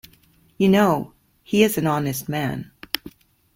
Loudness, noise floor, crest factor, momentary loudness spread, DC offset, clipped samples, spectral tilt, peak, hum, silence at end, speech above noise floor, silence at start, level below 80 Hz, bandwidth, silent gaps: -21 LUFS; -57 dBFS; 22 dB; 12 LU; under 0.1%; under 0.1%; -5.5 dB/octave; -2 dBFS; none; 0.45 s; 37 dB; 0.6 s; -54 dBFS; 16.5 kHz; none